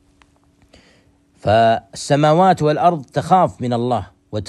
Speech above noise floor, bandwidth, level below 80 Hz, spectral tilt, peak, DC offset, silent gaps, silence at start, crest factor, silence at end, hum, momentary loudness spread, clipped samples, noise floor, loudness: 40 dB; 12 kHz; -52 dBFS; -6.5 dB/octave; -2 dBFS; under 0.1%; none; 1.45 s; 16 dB; 0.05 s; none; 10 LU; under 0.1%; -55 dBFS; -16 LUFS